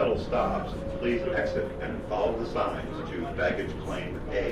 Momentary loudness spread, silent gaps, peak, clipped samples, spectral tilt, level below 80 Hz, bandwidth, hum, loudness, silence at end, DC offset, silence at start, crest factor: 7 LU; none; -14 dBFS; under 0.1%; -7 dB/octave; -42 dBFS; 13 kHz; none; -30 LUFS; 0 s; under 0.1%; 0 s; 16 dB